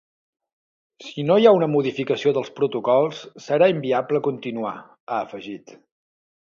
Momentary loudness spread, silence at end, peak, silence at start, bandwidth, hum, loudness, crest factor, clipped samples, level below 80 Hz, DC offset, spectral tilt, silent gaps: 20 LU; 0.9 s; -2 dBFS; 1 s; 7.2 kHz; none; -21 LUFS; 20 dB; under 0.1%; -70 dBFS; under 0.1%; -6.5 dB/octave; 5.00-5.07 s